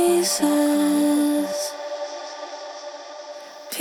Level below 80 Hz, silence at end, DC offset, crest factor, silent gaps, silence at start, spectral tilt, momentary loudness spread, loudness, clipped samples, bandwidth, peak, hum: -70 dBFS; 0 s; under 0.1%; 16 dB; none; 0 s; -3 dB/octave; 18 LU; -21 LUFS; under 0.1%; 18.5 kHz; -8 dBFS; none